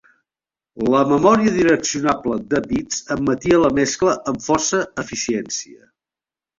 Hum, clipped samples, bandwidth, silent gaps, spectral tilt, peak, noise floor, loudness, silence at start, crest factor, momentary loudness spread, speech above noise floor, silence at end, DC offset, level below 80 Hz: none; under 0.1%; 7.8 kHz; none; -4 dB/octave; -2 dBFS; under -90 dBFS; -18 LUFS; 0.75 s; 18 dB; 10 LU; over 72 dB; 0.8 s; under 0.1%; -48 dBFS